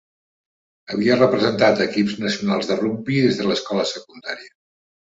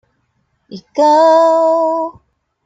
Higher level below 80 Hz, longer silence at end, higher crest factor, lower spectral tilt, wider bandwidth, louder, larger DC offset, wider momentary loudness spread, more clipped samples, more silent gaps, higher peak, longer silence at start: about the same, -60 dBFS vs -64 dBFS; about the same, 0.55 s vs 0.55 s; first, 18 dB vs 12 dB; about the same, -5.5 dB/octave vs -4.5 dB/octave; about the same, 8 kHz vs 7.8 kHz; second, -20 LUFS vs -11 LUFS; neither; about the same, 15 LU vs 14 LU; neither; neither; about the same, -2 dBFS vs -2 dBFS; first, 0.9 s vs 0.7 s